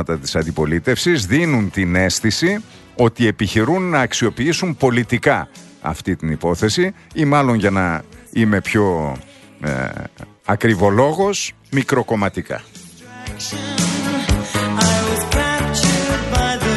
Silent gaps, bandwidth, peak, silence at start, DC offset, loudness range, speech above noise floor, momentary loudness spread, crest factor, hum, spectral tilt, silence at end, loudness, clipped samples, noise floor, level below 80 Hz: none; 12.5 kHz; 0 dBFS; 0 s; under 0.1%; 3 LU; 20 dB; 11 LU; 18 dB; none; -4.5 dB/octave; 0 s; -18 LUFS; under 0.1%; -37 dBFS; -34 dBFS